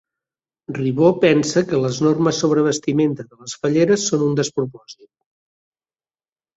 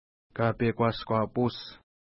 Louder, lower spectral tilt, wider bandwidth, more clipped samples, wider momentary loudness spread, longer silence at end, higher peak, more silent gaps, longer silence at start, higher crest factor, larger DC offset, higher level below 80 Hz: first, -18 LUFS vs -29 LUFS; second, -5.5 dB/octave vs -11 dB/octave; first, 8 kHz vs 5.8 kHz; neither; second, 10 LU vs 15 LU; first, 1.65 s vs 0.4 s; first, -2 dBFS vs -12 dBFS; neither; first, 0.7 s vs 0.35 s; about the same, 18 dB vs 18 dB; neither; second, -60 dBFS vs -54 dBFS